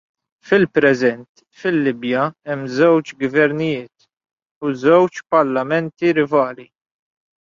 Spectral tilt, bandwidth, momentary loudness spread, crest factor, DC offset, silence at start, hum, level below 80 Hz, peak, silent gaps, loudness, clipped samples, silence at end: -7 dB/octave; 7.4 kHz; 10 LU; 16 dB; under 0.1%; 0.45 s; none; -62 dBFS; -2 dBFS; 1.29-1.35 s, 4.51-4.61 s; -17 LUFS; under 0.1%; 0.95 s